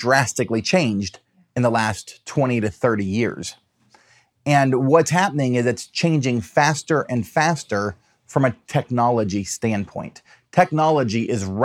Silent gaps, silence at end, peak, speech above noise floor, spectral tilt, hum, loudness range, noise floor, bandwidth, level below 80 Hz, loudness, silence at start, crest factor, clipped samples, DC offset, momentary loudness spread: none; 0 s; -2 dBFS; 37 dB; -5.5 dB/octave; none; 4 LU; -57 dBFS; 14.5 kHz; -60 dBFS; -20 LUFS; 0 s; 20 dB; under 0.1%; under 0.1%; 10 LU